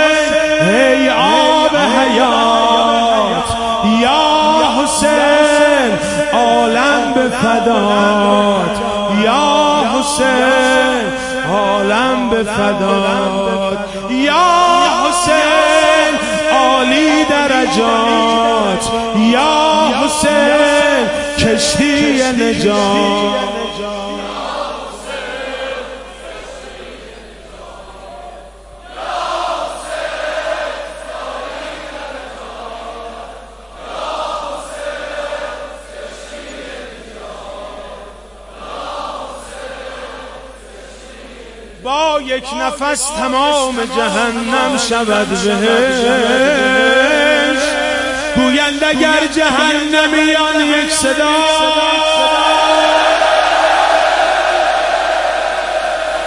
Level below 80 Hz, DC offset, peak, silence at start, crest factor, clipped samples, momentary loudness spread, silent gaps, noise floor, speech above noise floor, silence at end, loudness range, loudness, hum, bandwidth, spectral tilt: -40 dBFS; under 0.1%; 0 dBFS; 0 s; 14 dB; under 0.1%; 19 LU; none; -36 dBFS; 23 dB; 0 s; 16 LU; -12 LUFS; none; 11.5 kHz; -3 dB/octave